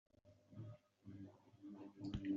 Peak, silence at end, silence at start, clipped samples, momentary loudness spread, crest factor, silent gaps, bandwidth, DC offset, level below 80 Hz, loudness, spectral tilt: -32 dBFS; 0 s; 0.25 s; under 0.1%; 12 LU; 20 dB; none; 7.4 kHz; under 0.1%; -68 dBFS; -56 LUFS; -7.5 dB/octave